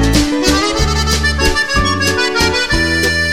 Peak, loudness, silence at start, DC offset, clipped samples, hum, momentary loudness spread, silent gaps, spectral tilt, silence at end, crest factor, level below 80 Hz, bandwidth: 0 dBFS; -13 LUFS; 0 s; 2%; under 0.1%; none; 1 LU; none; -3.5 dB/octave; 0 s; 14 dB; -20 dBFS; 16.5 kHz